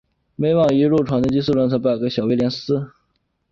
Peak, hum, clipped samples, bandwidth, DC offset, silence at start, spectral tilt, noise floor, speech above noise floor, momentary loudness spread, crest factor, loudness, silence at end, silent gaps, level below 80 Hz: -6 dBFS; none; under 0.1%; 7.4 kHz; under 0.1%; 0.4 s; -8 dB/octave; -69 dBFS; 51 dB; 8 LU; 14 dB; -19 LUFS; 0.65 s; none; -50 dBFS